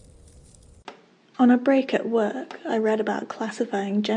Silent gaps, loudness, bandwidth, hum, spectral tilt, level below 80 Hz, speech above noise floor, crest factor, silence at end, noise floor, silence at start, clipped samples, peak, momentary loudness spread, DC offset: none; -23 LUFS; 9.8 kHz; none; -6 dB/octave; -60 dBFS; 28 dB; 18 dB; 0 s; -51 dBFS; 0.85 s; under 0.1%; -6 dBFS; 11 LU; under 0.1%